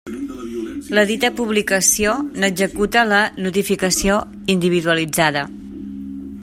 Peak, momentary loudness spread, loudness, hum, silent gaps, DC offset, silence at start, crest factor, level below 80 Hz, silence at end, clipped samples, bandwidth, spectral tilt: 0 dBFS; 15 LU; -17 LUFS; none; none; under 0.1%; 0.05 s; 18 dB; -42 dBFS; 0 s; under 0.1%; 16 kHz; -3 dB/octave